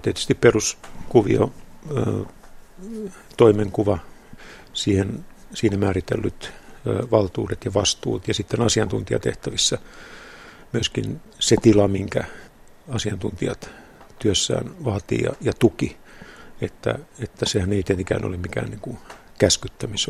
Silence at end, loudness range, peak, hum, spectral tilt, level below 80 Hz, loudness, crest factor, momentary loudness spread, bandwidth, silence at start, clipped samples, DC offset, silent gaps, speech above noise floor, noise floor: 0 s; 3 LU; 0 dBFS; none; -4.5 dB/octave; -46 dBFS; -22 LUFS; 22 dB; 19 LU; 14.5 kHz; 0 s; under 0.1%; under 0.1%; none; 21 dB; -43 dBFS